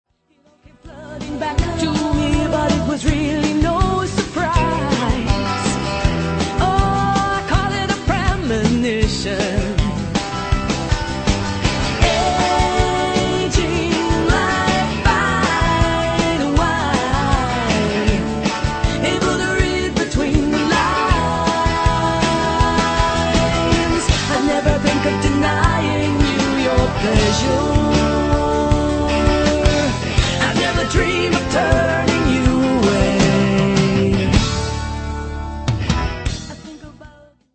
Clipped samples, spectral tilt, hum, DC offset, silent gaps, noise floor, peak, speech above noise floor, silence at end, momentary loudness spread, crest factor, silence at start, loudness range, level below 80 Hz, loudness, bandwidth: under 0.1%; -5 dB/octave; none; under 0.1%; none; -57 dBFS; 0 dBFS; 39 dB; 0.45 s; 5 LU; 16 dB; 0.85 s; 3 LU; -26 dBFS; -17 LUFS; 8.8 kHz